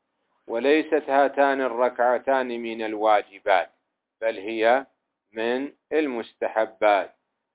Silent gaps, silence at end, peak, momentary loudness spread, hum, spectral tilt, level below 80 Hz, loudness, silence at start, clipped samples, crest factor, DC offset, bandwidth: none; 0.45 s; -6 dBFS; 9 LU; none; -7.5 dB/octave; -74 dBFS; -24 LUFS; 0.5 s; under 0.1%; 18 dB; under 0.1%; 4 kHz